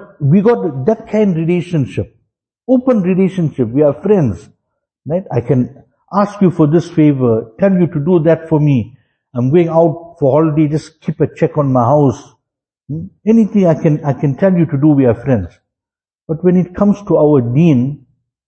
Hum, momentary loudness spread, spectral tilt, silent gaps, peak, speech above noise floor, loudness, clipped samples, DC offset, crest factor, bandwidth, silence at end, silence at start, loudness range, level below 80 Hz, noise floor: none; 10 LU; -9.5 dB/octave; none; 0 dBFS; 76 dB; -13 LUFS; under 0.1%; under 0.1%; 14 dB; 8.6 kHz; 0.5 s; 0 s; 2 LU; -46 dBFS; -88 dBFS